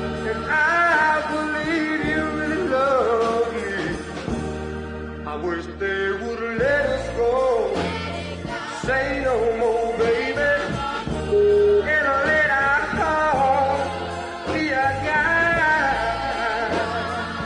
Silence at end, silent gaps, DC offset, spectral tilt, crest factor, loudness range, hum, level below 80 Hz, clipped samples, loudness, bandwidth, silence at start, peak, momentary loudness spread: 0 s; none; under 0.1%; -5.5 dB/octave; 14 dB; 5 LU; none; -42 dBFS; under 0.1%; -21 LUFS; 10.5 kHz; 0 s; -8 dBFS; 11 LU